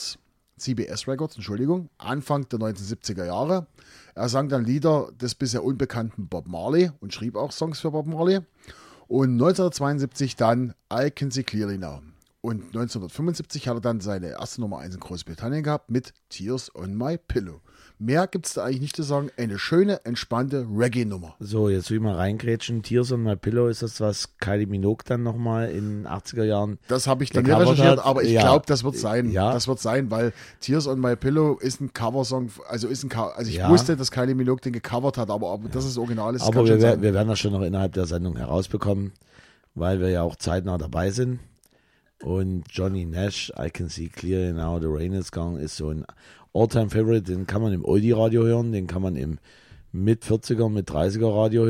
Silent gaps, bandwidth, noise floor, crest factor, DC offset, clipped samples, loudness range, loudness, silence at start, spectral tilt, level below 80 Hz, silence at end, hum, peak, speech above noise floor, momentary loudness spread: none; 15.5 kHz; -63 dBFS; 22 dB; under 0.1%; under 0.1%; 8 LU; -24 LUFS; 0 s; -6.5 dB/octave; -46 dBFS; 0 s; none; -2 dBFS; 40 dB; 12 LU